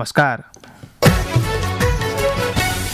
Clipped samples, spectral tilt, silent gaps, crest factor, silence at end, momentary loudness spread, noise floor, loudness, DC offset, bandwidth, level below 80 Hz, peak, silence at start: under 0.1%; -5 dB/octave; none; 14 dB; 0 s; 4 LU; -41 dBFS; -18 LUFS; under 0.1%; 16 kHz; -28 dBFS; -4 dBFS; 0 s